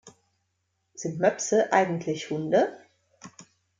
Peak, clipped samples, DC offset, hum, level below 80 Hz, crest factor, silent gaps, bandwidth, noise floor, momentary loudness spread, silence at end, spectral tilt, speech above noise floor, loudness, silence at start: -8 dBFS; under 0.1%; under 0.1%; none; -72 dBFS; 22 dB; none; 9.6 kHz; -76 dBFS; 9 LU; 0.35 s; -4.5 dB/octave; 52 dB; -26 LUFS; 0.05 s